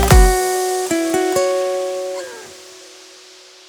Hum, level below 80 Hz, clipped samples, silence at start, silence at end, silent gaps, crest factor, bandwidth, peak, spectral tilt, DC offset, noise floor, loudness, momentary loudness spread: none; -22 dBFS; under 0.1%; 0 s; 0.8 s; none; 16 dB; over 20 kHz; 0 dBFS; -4.5 dB/octave; under 0.1%; -43 dBFS; -17 LUFS; 24 LU